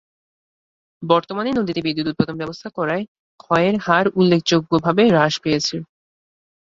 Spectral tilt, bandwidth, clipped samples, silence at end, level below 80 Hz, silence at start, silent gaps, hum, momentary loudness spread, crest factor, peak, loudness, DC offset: -5.5 dB/octave; 7.8 kHz; under 0.1%; 0.85 s; -56 dBFS; 1 s; 3.08-3.38 s; none; 11 LU; 18 dB; -2 dBFS; -19 LUFS; under 0.1%